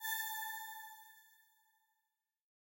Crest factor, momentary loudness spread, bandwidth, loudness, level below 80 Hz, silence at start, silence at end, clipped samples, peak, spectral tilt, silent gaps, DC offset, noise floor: 20 dB; 21 LU; 16 kHz; -43 LUFS; under -90 dBFS; 0 s; 1.25 s; under 0.1%; -28 dBFS; 6 dB/octave; none; under 0.1%; -88 dBFS